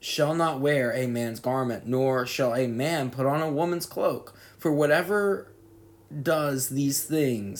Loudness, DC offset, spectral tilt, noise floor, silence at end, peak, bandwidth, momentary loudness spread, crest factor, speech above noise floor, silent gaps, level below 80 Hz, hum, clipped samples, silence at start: -26 LUFS; under 0.1%; -5 dB/octave; -53 dBFS; 0 s; -10 dBFS; 19.5 kHz; 6 LU; 16 dB; 27 dB; none; -66 dBFS; none; under 0.1%; 0.05 s